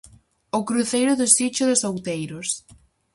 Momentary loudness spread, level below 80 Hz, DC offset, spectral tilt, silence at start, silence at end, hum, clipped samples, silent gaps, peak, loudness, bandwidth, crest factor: 12 LU; -60 dBFS; under 0.1%; -3 dB/octave; 0.05 s; 0.55 s; none; under 0.1%; none; 0 dBFS; -21 LUFS; 12 kHz; 22 dB